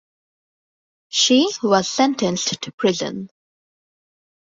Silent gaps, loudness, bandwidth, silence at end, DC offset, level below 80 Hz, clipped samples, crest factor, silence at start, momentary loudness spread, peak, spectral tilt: 2.74-2.78 s; -19 LUFS; 7.8 kHz; 1.3 s; under 0.1%; -64 dBFS; under 0.1%; 18 dB; 1.1 s; 12 LU; -4 dBFS; -3 dB/octave